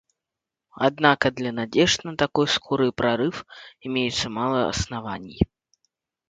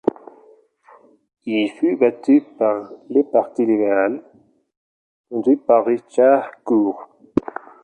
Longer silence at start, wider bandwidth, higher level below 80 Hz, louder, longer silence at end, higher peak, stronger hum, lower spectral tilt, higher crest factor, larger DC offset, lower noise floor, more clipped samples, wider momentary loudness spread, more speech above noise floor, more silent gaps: second, 0.75 s vs 1.45 s; about the same, 9.4 kHz vs 9 kHz; first, -46 dBFS vs -60 dBFS; second, -23 LUFS vs -19 LUFS; first, 0.85 s vs 0.45 s; about the same, -2 dBFS vs -2 dBFS; neither; second, -4.5 dB/octave vs -7 dB/octave; first, 22 dB vs 16 dB; neither; first, -87 dBFS vs -52 dBFS; neither; about the same, 10 LU vs 10 LU; first, 64 dB vs 34 dB; second, none vs 4.77-5.24 s